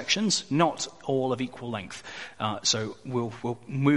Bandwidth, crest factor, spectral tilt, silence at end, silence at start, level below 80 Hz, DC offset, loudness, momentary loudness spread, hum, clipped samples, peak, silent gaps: 11.5 kHz; 22 dB; -4 dB/octave; 0 s; 0 s; -66 dBFS; 0.2%; -28 LUFS; 12 LU; none; under 0.1%; -6 dBFS; none